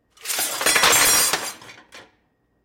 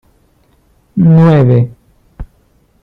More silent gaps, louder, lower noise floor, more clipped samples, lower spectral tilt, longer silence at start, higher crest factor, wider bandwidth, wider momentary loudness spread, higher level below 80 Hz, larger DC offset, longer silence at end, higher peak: neither; second, -17 LUFS vs -9 LUFS; first, -66 dBFS vs -52 dBFS; neither; second, 1 dB/octave vs -11 dB/octave; second, 0.25 s vs 0.95 s; about the same, 16 dB vs 12 dB; first, 17 kHz vs 4.3 kHz; about the same, 13 LU vs 13 LU; second, -54 dBFS vs -38 dBFS; neither; about the same, 0.65 s vs 0.6 s; second, -6 dBFS vs 0 dBFS